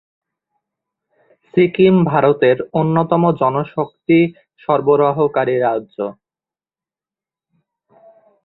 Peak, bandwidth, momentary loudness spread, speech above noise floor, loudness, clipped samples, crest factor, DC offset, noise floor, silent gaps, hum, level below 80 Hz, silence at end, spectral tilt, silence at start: 0 dBFS; 4.2 kHz; 11 LU; over 75 dB; -16 LUFS; under 0.1%; 16 dB; under 0.1%; under -90 dBFS; none; none; -58 dBFS; 2.35 s; -11.5 dB/octave; 1.55 s